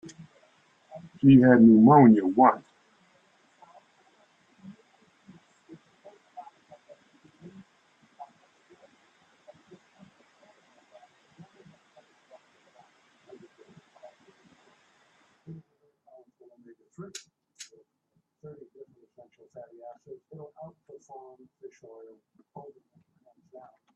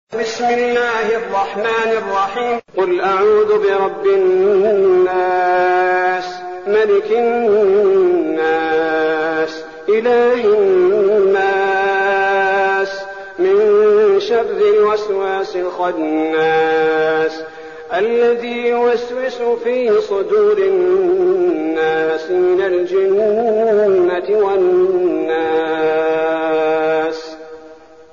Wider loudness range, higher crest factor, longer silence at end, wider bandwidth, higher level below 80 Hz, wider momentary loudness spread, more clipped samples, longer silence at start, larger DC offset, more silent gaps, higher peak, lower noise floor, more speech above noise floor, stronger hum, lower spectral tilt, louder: first, 30 LU vs 3 LU; first, 24 dB vs 10 dB; first, 3.3 s vs 0.4 s; first, 8.2 kHz vs 7.2 kHz; second, -68 dBFS vs -56 dBFS; first, 33 LU vs 7 LU; neither; first, 1.25 s vs 0.1 s; second, under 0.1% vs 0.3%; neither; about the same, -4 dBFS vs -4 dBFS; first, -75 dBFS vs -40 dBFS; first, 57 dB vs 26 dB; neither; first, -8.5 dB/octave vs -3 dB/octave; second, -18 LUFS vs -15 LUFS